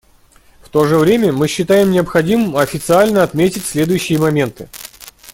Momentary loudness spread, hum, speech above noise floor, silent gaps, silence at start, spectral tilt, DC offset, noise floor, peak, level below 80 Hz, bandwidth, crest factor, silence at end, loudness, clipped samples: 9 LU; none; 35 dB; none; 0.75 s; -5.5 dB/octave; under 0.1%; -48 dBFS; 0 dBFS; -44 dBFS; 17 kHz; 14 dB; 0 s; -14 LUFS; under 0.1%